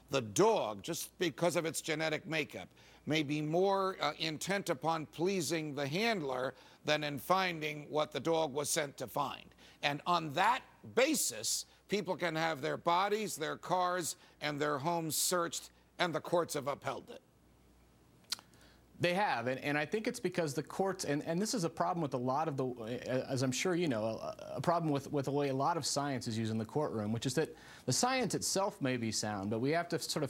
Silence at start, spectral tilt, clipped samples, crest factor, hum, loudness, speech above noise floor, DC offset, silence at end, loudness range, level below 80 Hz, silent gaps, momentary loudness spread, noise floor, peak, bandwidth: 0.1 s; -4 dB/octave; under 0.1%; 22 dB; none; -35 LUFS; 30 dB; under 0.1%; 0 s; 3 LU; -72 dBFS; none; 8 LU; -65 dBFS; -14 dBFS; 17 kHz